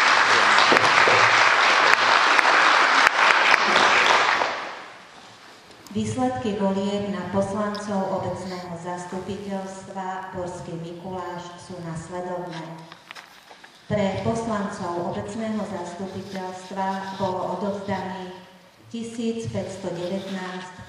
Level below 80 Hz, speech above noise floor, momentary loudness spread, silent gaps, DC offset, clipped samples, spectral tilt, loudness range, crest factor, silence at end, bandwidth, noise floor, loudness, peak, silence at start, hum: -58 dBFS; 20 dB; 19 LU; none; under 0.1%; under 0.1%; -3.5 dB/octave; 17 LU; 24 dB; 0 s; 14.5 kHz; -49 dBFS; -20 LUFS; 0 dBFS; 0 s; none